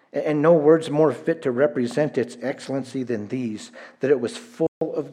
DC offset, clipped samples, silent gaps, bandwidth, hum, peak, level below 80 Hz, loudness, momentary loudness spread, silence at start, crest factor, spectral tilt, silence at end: under 0.1%; under 0.1%; 4.68-4.81 s; 11 kHz; none; -4 dBFS; -76 dBFS; -22 LUFS; 12 LU; 0.15 s; 18 dB; -7 dB/octave; 0 s